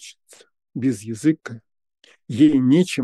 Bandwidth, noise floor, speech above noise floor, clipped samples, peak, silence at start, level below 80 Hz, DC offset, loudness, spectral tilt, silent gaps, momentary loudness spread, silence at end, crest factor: 12.5 kHz; -47 dBFS; 29 dB; under 0.1%; -4 dBFS; 0.05 s; -68 dBFS; under 0.1%; -19 LUFS; -6.5 dB/octave; none; 22 LU; 0 s; 16 dB